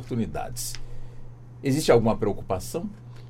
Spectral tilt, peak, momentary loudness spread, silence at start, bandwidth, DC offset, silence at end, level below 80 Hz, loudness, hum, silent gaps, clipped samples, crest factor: -5.5 dB/octave; -6 dBFS; 24 LU; 0 s; 16.5 kHz; under 0.1%; 0 s; -40 dBFS; -26 LUFS; none; none; under 0.1%; 20 dB